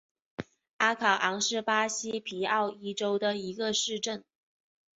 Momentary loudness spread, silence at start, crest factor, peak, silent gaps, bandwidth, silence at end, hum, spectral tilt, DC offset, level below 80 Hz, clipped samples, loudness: 17 LU; 0.4 s; 20 dB; -10 dBFS; 0.73-0.79 s; 8 kHz; 0.75 s; none; -1 dB/octave; under 0.1%; -74 dBFS; under 0.1%; -29 LUFS